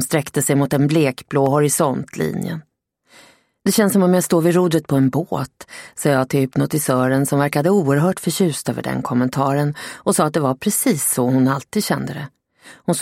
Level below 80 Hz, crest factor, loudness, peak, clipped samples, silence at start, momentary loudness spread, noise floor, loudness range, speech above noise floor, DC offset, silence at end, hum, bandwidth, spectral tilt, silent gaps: -56 dBFS; 16 dB; -18 LUFS; -2 dBFS; under 0.1%; 0 s; 9 LU; -53 dBFS; 1 LU; 35 dB; under 0.1%; 0 s; none; 16.5 kHz; -5.5 dB/octave; none